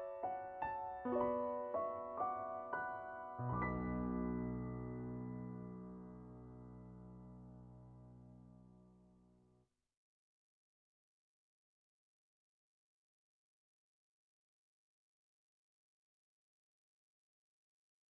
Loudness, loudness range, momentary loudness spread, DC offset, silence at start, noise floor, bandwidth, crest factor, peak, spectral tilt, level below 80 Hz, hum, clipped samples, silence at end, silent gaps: -44 LUFS; 20 LU; 19 LU; under 0.1%; 0 s; -77 dBFS; 3.8 kHz; 22 dB; -26 dBFS; -8.5 dB/octave; -64 dBFS; none; under 0.1%; 9 s; none